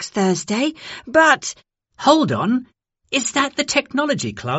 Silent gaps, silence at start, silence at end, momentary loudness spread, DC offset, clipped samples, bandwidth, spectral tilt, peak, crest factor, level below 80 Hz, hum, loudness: none; 0 s; 0 s; 9 LU; under 0.1%; under 0.1%; 8.2 kHz; -3.5 dB/octave; 0 dBFS; 20 dB; -58 dBFS; none; -18 LUFS